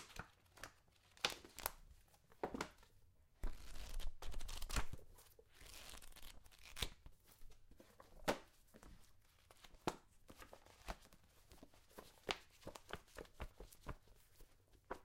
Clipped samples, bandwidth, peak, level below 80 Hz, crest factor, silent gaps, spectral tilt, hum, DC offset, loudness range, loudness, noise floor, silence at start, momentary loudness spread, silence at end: under 0.1%; 16.5 kHz; -16 dBFS; -56 dBFS; 34 dB; none; -3 dB/octave; none; under 0.1%; 6 LU; -51 LUFS; -71 dBFS; 0 s; 22 LU; 0 s